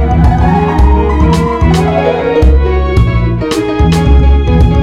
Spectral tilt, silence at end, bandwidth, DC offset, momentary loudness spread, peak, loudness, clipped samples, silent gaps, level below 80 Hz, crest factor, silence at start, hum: -7.5 dB/octave; 0 s; 11 kHz; under 0.1%; 3 LU; 0 dBFS; -10 LUFS; under 0.1%; none; -10 dBFS; 8 dB; 0 s; none